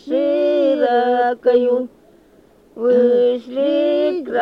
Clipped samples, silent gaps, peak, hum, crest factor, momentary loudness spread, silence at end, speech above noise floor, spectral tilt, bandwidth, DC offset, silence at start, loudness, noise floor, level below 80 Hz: under 0.1%; none; -4 dBFS; none; 12 dB; 5 LU; 0 s; 34 dB; -6.5 dB/octave; 5.6 kHz; under 0.1%; 0.05 s; -17 LUFS; -50 dBFS; -62 dBFS